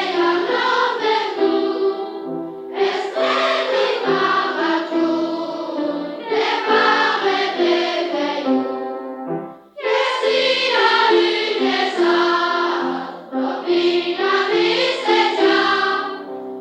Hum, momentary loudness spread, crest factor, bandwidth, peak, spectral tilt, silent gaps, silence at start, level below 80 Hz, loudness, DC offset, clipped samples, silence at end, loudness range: none; 12 LU; 14 dB; 9 kHz; -4 dBFS; -3.5 dB/octave; none; 0 s; -72 dBFS; -18 LUFS; under 0.1%; under 0.1%; 0 s; 3 LU